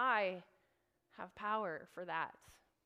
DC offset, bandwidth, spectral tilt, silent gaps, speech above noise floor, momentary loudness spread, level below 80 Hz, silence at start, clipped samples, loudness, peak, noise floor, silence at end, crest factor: under 0.1%; 15.5 kHz; -5 dB/octave; none; 37 dB; 16 LU; -80 dBFS; 0 s; under 0.1%; -41 LUFS; -22 dBFS; -80 dBFS; 0.35 s; 20 dB